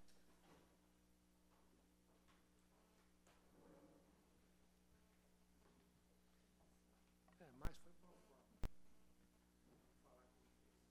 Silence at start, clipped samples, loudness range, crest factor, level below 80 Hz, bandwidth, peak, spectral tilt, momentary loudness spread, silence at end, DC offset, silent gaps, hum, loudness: 0 s; under 0.1%; 2 LU; 26 dB; -64 dBFS; 13 kHz; -34 dBFS; -5.5 dB/octave; 12 LU; 0 s; under 0.1%; none; 60 Hz at -80 dBFS; -60 LUFS